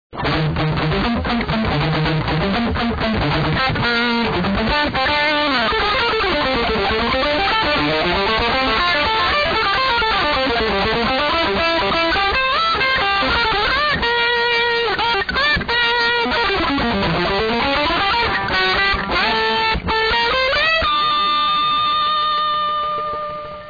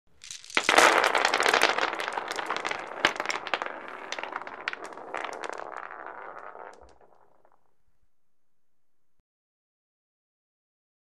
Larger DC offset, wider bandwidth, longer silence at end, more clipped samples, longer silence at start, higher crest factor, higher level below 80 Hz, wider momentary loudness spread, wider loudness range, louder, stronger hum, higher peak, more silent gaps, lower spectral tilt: second, under 0.1% vs 0.1%; second, 5 kHz vs 14.5 kHz; second, 0 s vs 4.3 s; neither; second, 0.1 s vs 0.25 s; second, 10 dB vs 26 dB; first, -34 dBFS vs -68 dBFS; second, 4 LU vs 22 LU; second, 2 LU vs 21 LU; first, -17 LUFS vs -26 LUFS; neither; about the same, -6 dBFS vs -4 dBFS; neither; first, -5.5 dB/octave vs -0.5 dB/octave